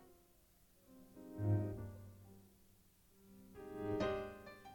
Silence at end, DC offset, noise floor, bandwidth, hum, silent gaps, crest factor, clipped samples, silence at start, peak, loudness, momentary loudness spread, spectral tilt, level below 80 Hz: 0 s; under 0.1%; -70 dBFS; 18 kHz; none; none; 20 dB; under 0.1%; 0 s; -26 dBFS; -43 LUFS; 25 LU; -8 dB/octave; -66 dBFS